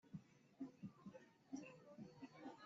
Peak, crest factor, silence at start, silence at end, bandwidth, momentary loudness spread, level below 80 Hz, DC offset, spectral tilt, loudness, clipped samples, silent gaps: -40 dBFS; 18 dB; 0.05 s; 0 s; 7.4 kHz; 6 LU; -90 dBFS; under 0.1%; -6.5 dB/octave; -59 LUFS; under 0.1%; none